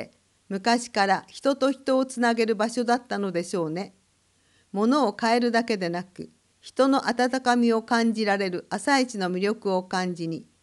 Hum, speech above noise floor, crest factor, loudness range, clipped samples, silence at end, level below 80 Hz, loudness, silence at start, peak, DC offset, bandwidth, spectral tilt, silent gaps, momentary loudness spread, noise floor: none; 41 dB; 18 dB; 3 LU; under 0.1%; 0.2 s; -72 dBFS; -25 LUFS; 0 s; -8 dBFS; under 0.1%; 12 kHz; -4.5 dB/octave; none; 12 LU; -65 dBFS